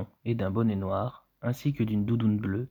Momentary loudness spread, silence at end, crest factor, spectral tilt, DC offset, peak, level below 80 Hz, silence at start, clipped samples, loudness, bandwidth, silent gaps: 7 LU; 0.05 s; 14 dB; -9 dB/octave; under 0.1%; -14 dBFS; -58 dBFS; 0 s; under 0.1%; -29 LUFS; over 20 kHz; none